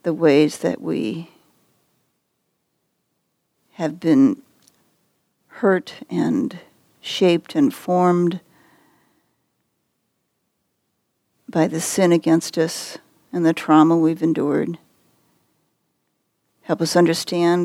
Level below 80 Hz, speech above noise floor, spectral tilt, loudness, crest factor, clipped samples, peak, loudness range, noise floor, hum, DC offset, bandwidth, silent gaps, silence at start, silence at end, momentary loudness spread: -72 dBFS; 54 dB; -5.5 dB/octave; -19 LUFS; 20 dB; under 0.1%; -2 dBFS; 9 LU; -73 dBFS; none; under 0.1%; 15.5 kHz; none; 0.05 s; 0 s; 14 LU